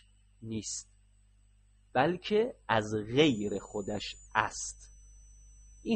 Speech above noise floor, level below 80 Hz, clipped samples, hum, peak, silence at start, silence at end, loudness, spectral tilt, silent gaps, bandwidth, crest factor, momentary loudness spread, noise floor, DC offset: 32 dB; -58 dBFS; under 0.1%; 50 Hz at -55 dBFS; -8 dBFS; 0.4 s; 0 s; -32 LUFS; -4.5 dB/octave; none; 8.8 kHz; 24 dB; 14 LU; -63 dBFS; under 0.1%